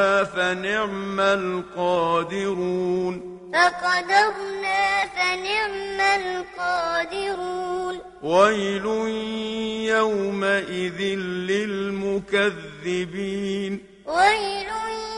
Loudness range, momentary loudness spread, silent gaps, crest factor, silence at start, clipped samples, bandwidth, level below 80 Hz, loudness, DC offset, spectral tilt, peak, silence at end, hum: 3 LU; 9 LU; none; 20 dB; 0 s; under 0.1%; 11 kHz; -56 dBFS; -23 LUFS; under 0.1%; -4 dB/octave; -4 dBFS; 0 s; none